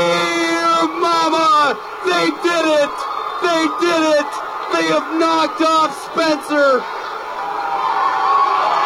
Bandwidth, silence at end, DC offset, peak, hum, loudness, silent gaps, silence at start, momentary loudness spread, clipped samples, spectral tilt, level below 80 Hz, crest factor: 16 kHz; 0 s; under 0.1%; -6 dBFS; none; -16 LUFS; none; 0 s; 8 LU; under 0.1%; -3 dB/octave; -60 dBFS; 10 dB